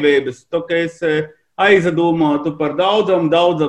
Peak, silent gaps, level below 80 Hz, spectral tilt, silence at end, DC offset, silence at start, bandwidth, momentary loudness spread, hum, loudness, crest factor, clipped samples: -2 dBFS; none; -56 dBFS; -6.5 dB/octave; 0 s; under 0.1%; 0 s; 9.2 kHz; 8 LU; none; -16 LUFS; 14 dB; under 0.1%